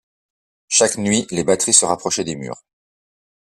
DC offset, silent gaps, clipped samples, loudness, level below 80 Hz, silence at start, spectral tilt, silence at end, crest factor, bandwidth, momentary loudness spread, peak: under 0.1%; none; under 0.1%; -16 LUFS; -58 dBFS; 0.7 s; -2.5 dB/octave; 1.05 s; 20 dB; 14 kHz; 16 LU; 0 dBFS